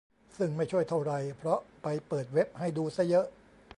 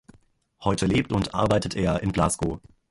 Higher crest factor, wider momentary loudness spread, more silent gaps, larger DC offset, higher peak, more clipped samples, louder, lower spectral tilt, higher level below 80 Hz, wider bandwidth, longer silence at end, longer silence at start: about the same, 16 dB vs 18 dB; about the same, 7 LU vs 7 LU; neither; neither; second, -16 dBFS vs -6 dBFS; neither; second, -32 LUFS vs -25 LUFS; first, -7.5 dB/octave vs -5.5 dB/octave; second, -68 dBFS vs -42 dBFS; about the same, 11 kHz vs 11.5 kHz; about the same, 0.45 s vs 0.35 s; second, 0.35 s vs 0.6 s